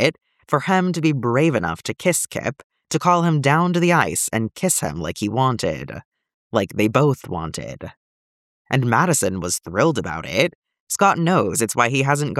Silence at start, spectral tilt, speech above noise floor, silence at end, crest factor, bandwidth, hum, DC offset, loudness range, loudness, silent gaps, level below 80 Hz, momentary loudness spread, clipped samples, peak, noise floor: 0 s; -4.5 dB/octave; over 70 dB; 0 s; 18 dB; 16 kHz; none; under 0.1%; 4 LU; -20 LUFS; 2.64-2.70 s, 6.05-6.12 s, 6.34-6.50 s, 7.97-8.65 s, 10.55-10.62 s, 10.80-10.87 s; -52 dBFS; 11 LU; under 0.1%; -2 dBFS; under -90 dBFS